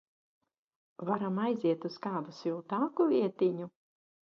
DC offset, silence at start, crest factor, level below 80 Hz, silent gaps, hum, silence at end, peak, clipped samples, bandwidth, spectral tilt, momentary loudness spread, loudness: under 0.1%; 1 s; 16 dB; -82 dBFS; none; none; 0.65 s; -18 dBFS; under 0.1%; 6.8 kHz; -8.5 dB/octave; 10 LU; -33 LUFS